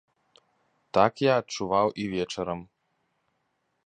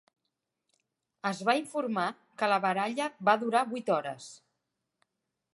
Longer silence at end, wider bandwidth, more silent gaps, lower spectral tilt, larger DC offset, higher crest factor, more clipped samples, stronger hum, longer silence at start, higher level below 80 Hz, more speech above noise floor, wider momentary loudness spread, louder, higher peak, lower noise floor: about the same, 1.2 s vs 1.2 s; second, 9.8 kHz vs 11.5 kHz; neither; about the same, -5.5 dB/octave vs -4.5 dB/octave; neither; about the same, 24 dB vs 22 dB; neither; neither; second, 0.95 s vs 1.25 s; first, -60 dBFS vs -86 dBFS; second, 50 dB vs 55 dB; about the same, 10 LU vs 9 LU; first, -26 LUFS vs -30 LUFS; first, -6 dBFS vs -10 dBFS; second, -76 dBFS vs -84 dBFS